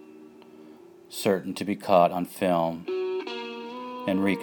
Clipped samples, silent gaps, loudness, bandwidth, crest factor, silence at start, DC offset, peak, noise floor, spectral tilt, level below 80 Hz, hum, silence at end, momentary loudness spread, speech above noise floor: under 0.1%; none; -27 LUFS; over 20 kHz; 22 dB; 0 s; under 0.1%; -6 dBFS; -49 dBFS; -5.5 dB/octave; -70 dBFS; none; 0 s; 15 LU; 25 dB